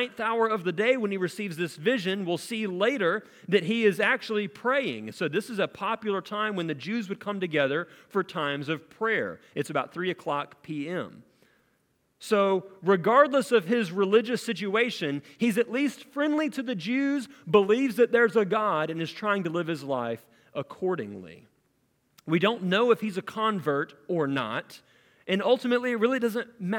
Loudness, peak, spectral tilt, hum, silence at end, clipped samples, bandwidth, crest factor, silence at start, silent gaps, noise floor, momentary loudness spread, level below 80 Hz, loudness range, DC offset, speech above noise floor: -27 LUFS; -6 dBFS; -5.5 dB/octave; none; 0 s; under 0.1%; 17 kHz; 22 dB; 0 s; none; -71 dBFS; 10 LU; -78 dBFS; 6 LU; under 0.1%; 44 dB